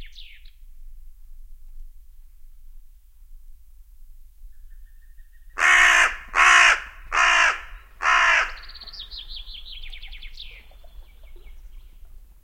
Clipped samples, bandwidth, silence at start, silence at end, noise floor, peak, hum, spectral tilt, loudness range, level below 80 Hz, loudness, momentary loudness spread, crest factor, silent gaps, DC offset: under 0.1%; 16.5 kHz; 0 s; 0.65 s; -46 dBFS; -2 dBFS; none; 1 dB/octave; 23 LU; -42 dBFS; -17 LUFS; 26 LU; 22 dB; none; under 0.1%